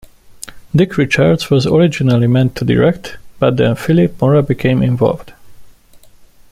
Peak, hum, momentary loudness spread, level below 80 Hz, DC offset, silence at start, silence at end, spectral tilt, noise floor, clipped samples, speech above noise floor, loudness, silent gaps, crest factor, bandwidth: 0 dBFS; none; 13 LU; -40 dBFS; under 0.1%; 0.3 s; 0.8 s; -7 dB/octave; -42 dBFS; under 0.1%; 30 dB; -13 LUFS; none; 14 dB; 15 kHz